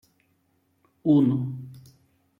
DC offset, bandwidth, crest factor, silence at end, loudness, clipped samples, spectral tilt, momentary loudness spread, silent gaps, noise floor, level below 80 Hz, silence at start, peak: under 0.1%; 5.4 kHz; 18 dB; 0.6 s; -23 LUFS; under 0.1%; -10.5 dB/octave; 20 LU; none; -69 dBFS; -68 dBFS; 1.05 s; -10 dBFS